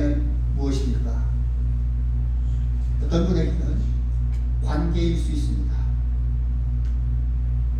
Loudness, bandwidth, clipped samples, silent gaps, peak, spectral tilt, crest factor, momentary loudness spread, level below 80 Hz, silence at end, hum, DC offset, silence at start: -24 LUFS; 7 kHz; under 0.1%; none; -8 dBFS; -8 dB/octave; 12 dB; 3 LU; -22 dBFS; 0 s; 60 Hz at -30 dBFS; under 0.1%; 0 s